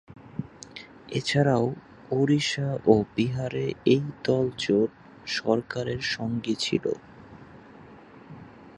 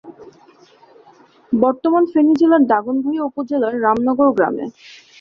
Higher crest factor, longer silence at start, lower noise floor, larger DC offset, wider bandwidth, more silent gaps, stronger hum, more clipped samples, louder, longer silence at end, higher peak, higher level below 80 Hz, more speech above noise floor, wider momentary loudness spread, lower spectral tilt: first, 22 dB vs 16 dB; about the same, 0.1 s vs 0.05 s; about the same, -48 dBFS vs -49 dBFS; neither; first, 11.5 kHz vs 6.6 kHz; neither; neither; neither; second, -26 LUFS vs -16 LUFS; second, 0.05 s vs 0.25 s; about the same, -4 dBFS vs -2 dBFS; about the same, -58 dBFS vs -60 dBFS; second, 23 dB vs 33 dB; first, 20 LU vs 9 LU; second, -6 dB/octave vs -7.5 dB/octave